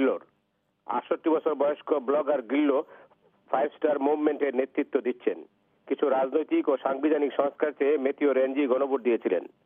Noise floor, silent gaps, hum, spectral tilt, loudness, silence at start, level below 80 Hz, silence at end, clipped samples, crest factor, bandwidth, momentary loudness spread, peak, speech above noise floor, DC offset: -74 dBFS; none; none; -8.5 dB/octave; -27 LUFS; 0 s; -90 dBFS; 0.2 s; under 0.1%; 16 dB; 3.7 kHz; 6 LU; -10 dBFS; 48 dB; under 0.1%